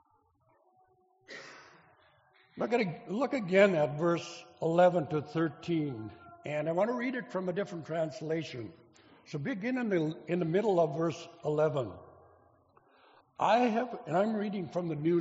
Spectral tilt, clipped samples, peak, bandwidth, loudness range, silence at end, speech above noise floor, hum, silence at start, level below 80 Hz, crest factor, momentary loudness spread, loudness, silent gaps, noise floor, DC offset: -5.5 dB/octave; under 0.1%; -8 dBFS; 8 kHz; 6 LU; 0 s; 40 dB; none; 1.3 s; -74 dBFS; 24 dB; 18 LU; -31 LUFS; none; -70 dBFS; under 0.1%